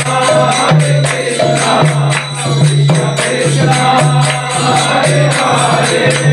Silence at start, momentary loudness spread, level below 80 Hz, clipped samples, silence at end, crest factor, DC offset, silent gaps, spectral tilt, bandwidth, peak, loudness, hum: 0 s; 3 LU; -46 dBFS; under 0.1%; 0 s; 10 dB; under 0.1%; none; -4.5 dB/octave; 12 kHz; 0 dBFS; -10 LUFS; none